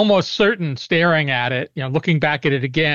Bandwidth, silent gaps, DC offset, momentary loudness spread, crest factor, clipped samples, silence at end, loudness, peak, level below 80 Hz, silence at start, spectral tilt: 7.2 kHz; none; 0.3%; 7 LU; 12 dB; under 0.1%; 0 s; -18 LUFS; -6 dBFS; -54 dBFS; 0 s; -6 dB/octave